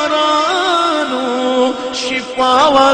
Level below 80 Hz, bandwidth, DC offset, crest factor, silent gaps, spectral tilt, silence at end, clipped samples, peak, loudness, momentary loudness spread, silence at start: -50 dBFS; 10 kHz; under 0.1%; 14 dB; none; -2.5 dB/octave; 0 s; under 0.1%; 0 dBFS; -14 LUFS; 8 LU; 0 s